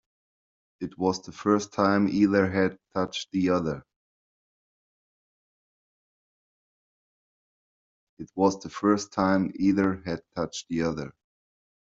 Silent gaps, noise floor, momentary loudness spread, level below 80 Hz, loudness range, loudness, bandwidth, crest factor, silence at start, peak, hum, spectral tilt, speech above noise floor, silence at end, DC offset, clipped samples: 3.96-8.17 s; under -90 dBFS; 13 LU; -62 dBFS; 9 LU; -26 LUFS; 7.8 kHz; 22 dB; 0.8 s; -6 dBFS; none; -6 dB/octave; over 64 dB; 0.85 s; under 0.1%; under 0.1%